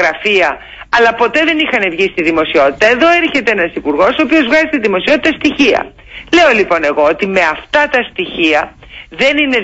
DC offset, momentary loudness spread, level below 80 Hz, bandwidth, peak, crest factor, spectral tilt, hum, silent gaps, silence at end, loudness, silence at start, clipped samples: under 0.1%; 6 LU; -42 dBFS; 8 kHz; 0 dBFS; 12 dB; -4 dB/octave; none; none; 0 s; -11 LUFS; 0 s; under 0.1%